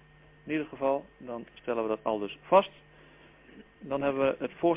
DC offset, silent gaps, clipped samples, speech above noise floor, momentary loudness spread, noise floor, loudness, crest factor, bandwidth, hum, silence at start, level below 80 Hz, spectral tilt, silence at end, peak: under 0.1%; none; under 0.1%; 26 dB; 16 LU; -56 dBFS; -30 LUFS; 22 dB; 3.8 kHz; none; 0.45 s; -64 dBFS; -9.5 dB/octave; 0 s; -10 dBFS